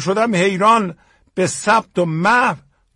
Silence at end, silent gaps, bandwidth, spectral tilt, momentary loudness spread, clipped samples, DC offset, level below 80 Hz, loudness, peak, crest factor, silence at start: 0.4 s; none; 11.5 kHz; -4.5 dB/octave; 11 LU; under 0.1%; under 0.1%; -58 dBFS; -16 LUFS; -2 dBFS; 16 dB; 0 s